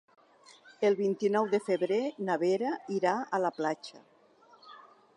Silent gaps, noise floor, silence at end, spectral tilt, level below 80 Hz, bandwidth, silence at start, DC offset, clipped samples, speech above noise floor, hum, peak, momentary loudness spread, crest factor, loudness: none; -61 dBFS; 0.4 s; -6 dB/octave; -88 dBFS; 11 kHz; 0.8 s; under 0.1%; under 0.1%; 31 dB; none; -14 dBFS; 6 LU; 18 dB; -30 LUFS